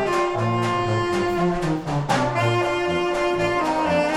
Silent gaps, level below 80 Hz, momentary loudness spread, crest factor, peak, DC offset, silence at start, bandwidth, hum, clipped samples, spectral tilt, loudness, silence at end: none; -44 dBFS; 2 LU; 14 dB; -8 dBFS; under 0.1%; 0 s; 12.5 kHz; none; under 0.1%; -6 dB/octave; -22 LUFS; 0 s